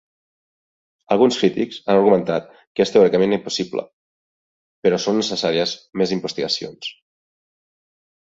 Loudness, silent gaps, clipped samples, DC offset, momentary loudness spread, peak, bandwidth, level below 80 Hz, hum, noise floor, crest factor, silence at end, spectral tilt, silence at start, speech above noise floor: -19 LUFS; 2.67-2.75 s, 3.93-4.83 s; under 0.1%; under 0.1%; 11 LU; -2 dBFS; 8 kHz; -62 dBFS; none; under -90 dBFS; 20 dB; 1.35 s; -5 dB/octave; 1.1 s; over 71 dB